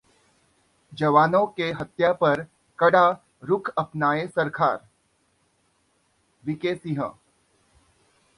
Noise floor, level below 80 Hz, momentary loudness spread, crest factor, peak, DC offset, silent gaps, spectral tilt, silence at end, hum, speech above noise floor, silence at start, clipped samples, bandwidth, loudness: -68 dBFS; -64 dBFS; 15 LU; 20 dB; -6 dBFS; under 0.1%; none; -7 dB/octave; 1.25 s; none; 45 dB; 0.9 s; under 0.1%; 11 kHz; -23 LUFS